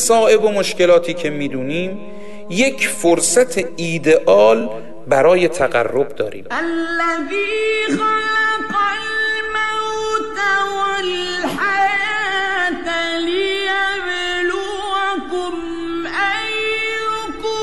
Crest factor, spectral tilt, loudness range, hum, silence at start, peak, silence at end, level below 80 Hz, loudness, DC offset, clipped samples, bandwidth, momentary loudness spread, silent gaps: 14 dB; -3 dB/octave; 5 LU; none; 0 s; -2 dBFS; 0 s; -50 dBFS; -17 LUFS; 2%; under 0.1%; 12 kHz; 10 LU; none